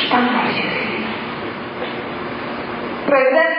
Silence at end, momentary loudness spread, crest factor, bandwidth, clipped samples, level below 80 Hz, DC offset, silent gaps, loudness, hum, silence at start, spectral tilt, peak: 0 s; 11 LU; 16 dB; 5.6 kHz; under 0.1%; -54 dBFS; under 0.1%; none; -20 LUFS; none; 0 s; -8 dB/octave; -2 dBFS